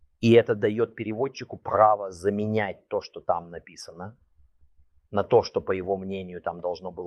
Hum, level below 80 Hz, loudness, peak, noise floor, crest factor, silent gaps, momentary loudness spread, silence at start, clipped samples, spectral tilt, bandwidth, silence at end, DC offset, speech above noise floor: none; -62 dBFS; -26 LUFS; -4 dBFS; -59 dBFS; 22 dB; none; 20 LU; 0.2 s; under 0.1%; -7 dB/octave; 11 kHz; 0 s; under 0.1%; 33 dB